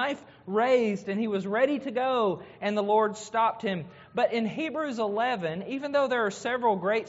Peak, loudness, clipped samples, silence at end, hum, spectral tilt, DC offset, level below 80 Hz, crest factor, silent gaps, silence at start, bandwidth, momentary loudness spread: -12 dBFS; -28 LUFS; under 0.1%; 0 s; none; -3.5 dB/octave; under 0.1%; -74 dBFS; 16 dB; none; 0 s; 8 kHz; 8 LU